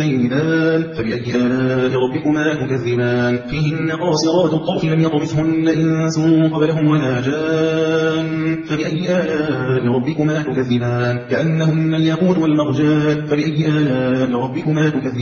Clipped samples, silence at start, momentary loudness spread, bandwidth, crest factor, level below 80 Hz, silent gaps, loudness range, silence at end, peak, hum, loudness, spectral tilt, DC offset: under 0.1%; 0 s; 4 LU; 7.4 kHz; 14 dB; -48 dBFS; none; 2 LU; 0 s; -4 dBFS; none; -17 LUFS; -7 dB/octave; under 0.1%